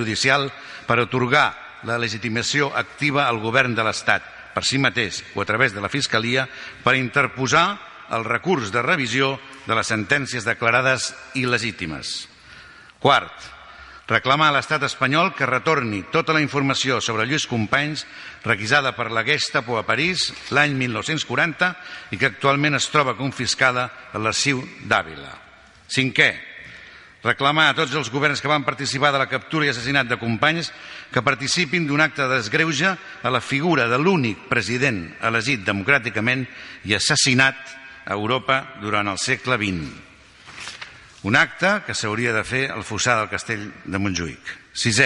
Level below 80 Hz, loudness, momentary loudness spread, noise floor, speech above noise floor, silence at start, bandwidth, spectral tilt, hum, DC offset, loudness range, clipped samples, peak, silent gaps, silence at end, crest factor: -54 dBFS; -20 LUFS; 12 LU; -45 dBFS; 24 dB; 0 s; 11.5 kHz; -3.5 dB/octave; none; under 0.1%; 3 LU; under 0.1%; 0 dBFS; none; 0 s; 22 dB